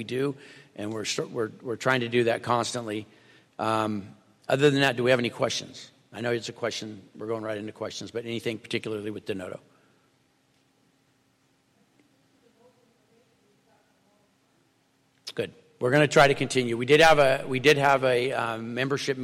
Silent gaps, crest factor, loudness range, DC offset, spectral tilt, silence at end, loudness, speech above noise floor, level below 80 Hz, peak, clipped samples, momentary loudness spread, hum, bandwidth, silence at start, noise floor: none; 20 dB; 16 LU; under 0.1%; -4.5 dB/octave; 0 s; -25 LUFS; 42 dB; -60 dBFS; -6 dBFS; under 0.1%; 18 LU; none; 15.5 kHz; 0 s; -67 dBFS